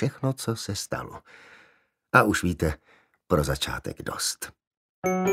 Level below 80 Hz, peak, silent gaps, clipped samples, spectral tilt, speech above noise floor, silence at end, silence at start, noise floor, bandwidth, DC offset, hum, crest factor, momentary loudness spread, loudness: -44 dBFS; -2 dBFS; 4.67-4.71 s, 4.77-5.02 s; under 0.1%; -4.5 dB/octave; 37 dB; 0 s; 0 s; -63 dBFS; 16 kHz; under 0.1%; none; 26 dB; 16 LU; -27 LUFS